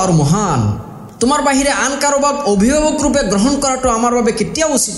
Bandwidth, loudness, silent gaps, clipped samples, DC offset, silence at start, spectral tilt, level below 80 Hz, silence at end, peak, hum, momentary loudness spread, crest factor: 12.5 kHz; -14 LUFS; none; under 0.1%; under 0.1%; 0 s; -4.5 dB/octave; -34 dBFS; 0 s; -2 dBFS; none; 4 LU; 12 dB